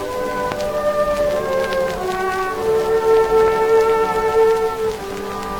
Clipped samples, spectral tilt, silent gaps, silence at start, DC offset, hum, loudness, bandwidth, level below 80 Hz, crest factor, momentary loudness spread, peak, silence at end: under 0.1%; -4.5 dB/octave; none; 0 s; under 0.1%; none; -18 LUFS; 18.5 kHz; -40 dBFS; 16 dB; 8 LU; -2 dBFS; 0 s